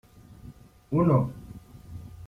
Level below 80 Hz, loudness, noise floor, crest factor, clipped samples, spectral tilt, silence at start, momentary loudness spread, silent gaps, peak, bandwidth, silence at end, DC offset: -52 dBFS; -25 LUFS; -49 dBFS; 18 dB; under 0.1%; -10.5 dB/octave; 0.3 s; 26 LU; none; -12 dBFS; 11.5 kHz; 0 s; under 0.1%